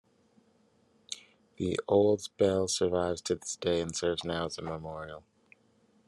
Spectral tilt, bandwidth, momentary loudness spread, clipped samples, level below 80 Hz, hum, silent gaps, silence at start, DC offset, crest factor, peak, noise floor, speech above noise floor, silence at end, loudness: -4.5 dB/octave; 12.5 kHz; 17 LU; under 0.1%; -66 dBFS; none; none; 1.1 s; under 0.1%; 20 dB; -12 dBFS; -67 dBFS; 37 dB; 0.9 s; -31 LUFS